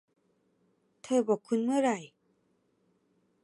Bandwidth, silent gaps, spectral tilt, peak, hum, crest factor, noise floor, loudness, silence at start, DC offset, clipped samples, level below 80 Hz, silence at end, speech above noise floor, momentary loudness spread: 11.5 kHz; none; -5 dB/octave; -14 dBFS; none; 20 dB; -73 dBFS; -30 LUFS; 1.05 s; under 0.1%; under 0.1%; -86 dBFS; 1.4 s; 45 dB; 3 LU